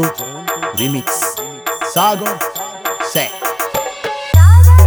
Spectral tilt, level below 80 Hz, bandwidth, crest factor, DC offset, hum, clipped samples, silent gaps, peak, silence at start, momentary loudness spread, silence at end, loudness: -4.5 dB/octave; -24 dBFS; over 20 kHz; 12 dB; under 0.1%; none; 0.1%; none; 0 dBFS; 0 s; 14 LU; 0 s; -15 LUFS